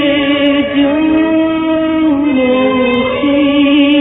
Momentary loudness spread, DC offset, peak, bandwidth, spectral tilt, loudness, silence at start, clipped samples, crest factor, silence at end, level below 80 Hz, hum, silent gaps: 3 LU; under 0.1%; -2 dBFS; 4 kHz; -8.5 dB/octave; -11 LUFS; 0 s; under 0.1%; 10 dB; 0 s; -40 dBFS; none; none